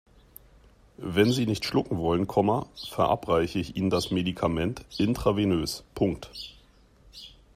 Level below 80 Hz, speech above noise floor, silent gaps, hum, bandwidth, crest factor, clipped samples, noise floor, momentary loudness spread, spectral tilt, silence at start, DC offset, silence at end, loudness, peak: -50 dBFS; 31 dB; none; none; 15.5 kHz; 20 dB; under 0.1%; -57 dBFS; 16 LU; -6 dB/octave; 1 s; under 0.1%; 0.25 s; -27 LUFS; -8 dBFS